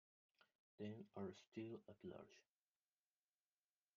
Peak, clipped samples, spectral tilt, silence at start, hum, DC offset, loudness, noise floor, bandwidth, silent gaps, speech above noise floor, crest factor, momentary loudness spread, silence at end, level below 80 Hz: -40 dBFS; under 0.1%; -6.5 dB/octave; 0.4 s; 50 Hz at -80 dBFS; under 0.1%; -56 LUFS; under -90 dBFS; 7 kHz; 0.55-0.78 s, 1.47-1.52 s; over 34 dB; 20 dB; 6 LU; 1.55 s; under -90 dBFS